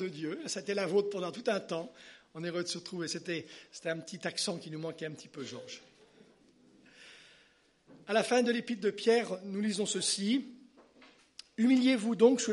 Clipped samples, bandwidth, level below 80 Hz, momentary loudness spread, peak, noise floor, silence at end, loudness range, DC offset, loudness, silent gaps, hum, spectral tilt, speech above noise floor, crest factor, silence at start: under 0.1%; 11.5 kHz; -82 dBFS; 21 LU; -10 dBFS; -67 dBFS; 0 s; 10 LU; under 0.1%; -32 LUFS; none; none; -4 dB/octave; 34 dB; 22 dB; 0 s